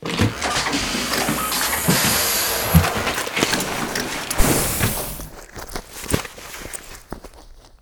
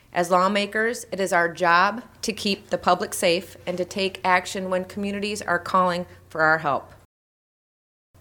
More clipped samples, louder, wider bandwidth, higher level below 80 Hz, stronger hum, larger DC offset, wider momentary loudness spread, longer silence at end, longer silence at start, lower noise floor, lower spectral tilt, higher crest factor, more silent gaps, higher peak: neither; first, -20 LUFS vs -23 LUFS; about the same, over 20 kHz vs 19 kHz; first, -32 dBFS vs -60 dBFS; neither; neither; first, 17 LU vs 10 LU; second, 0.05 s vs 1.25 s; second, 0 s vs 0.15 s; second, -44 dBFS vs under -90 dBFS; about the same, -3 dB/octave vs -3.5 dB/octave; about the same, 22 dB vs 20 dB; neither; first, 0 dBFS vs -4 dBFS